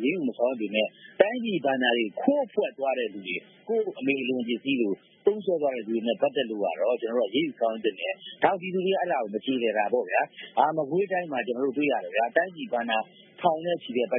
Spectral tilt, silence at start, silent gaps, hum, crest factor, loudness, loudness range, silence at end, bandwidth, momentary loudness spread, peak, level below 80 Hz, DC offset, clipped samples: -9.5 dB/octave; 0 s; none; none; 24 dB; -27 LUFS; 2 LU; 0 s; 3.9 kHz; 5 LU; -4 dBFS; -84 dBFS; under 0.1%; under 0.1%